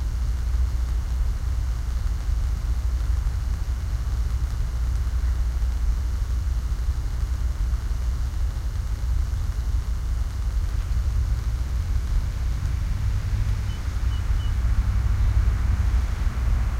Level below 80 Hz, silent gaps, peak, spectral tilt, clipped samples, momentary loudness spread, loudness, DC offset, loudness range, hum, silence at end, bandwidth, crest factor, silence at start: -24 dBFS; none; -10 dBFS; -6 dB/octave; under 0.1%; 4 LU; -27 LUFS; under 0.1%; 3 LU; none; 0 s; 13.5 kHz; 14 dB; 0 s